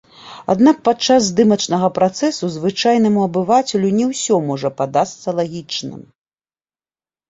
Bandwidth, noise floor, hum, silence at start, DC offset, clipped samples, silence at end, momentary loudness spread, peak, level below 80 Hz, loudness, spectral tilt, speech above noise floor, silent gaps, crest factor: 8 kHz; under -90 dBFS; none; 0.25 s; under 0.1%; under 0.1%; 1.3 s; 9 LU; -2 dBFS; -58 dBFS; -16 LUFS; -5 dB/octave; over 74 dB; none; 16 dB